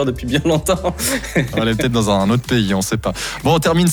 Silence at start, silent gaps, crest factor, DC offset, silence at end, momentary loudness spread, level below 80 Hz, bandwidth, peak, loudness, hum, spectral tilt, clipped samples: 0 s; none; 12 dB; under 0.1%; 0 s; 5 LU; -34 dBFS; over 20 kHz; -4 dBFS; -17 LUFS; none; -5 dB/octave; under 0.1%